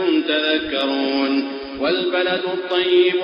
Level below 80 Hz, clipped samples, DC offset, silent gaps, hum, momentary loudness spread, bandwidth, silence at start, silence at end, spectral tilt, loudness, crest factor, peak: -56 dBFS; under 0.1%; under 0.1%; none; none; 6 LU; 5.4 kHz; 0 s; 0 s; -6 dB/octave; -19 LUFS; 14 dB; -4 dBFS